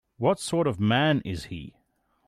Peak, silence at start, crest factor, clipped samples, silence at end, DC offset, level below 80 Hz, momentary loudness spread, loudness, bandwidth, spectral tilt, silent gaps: -10 dBFS; 0.2 s; 16 dB; under 0.1%; 0.6 s; under 0.1%; -56 dBFS; 14 LU; -25 LUFS; 15 kHz; -5.5 dB/octave; none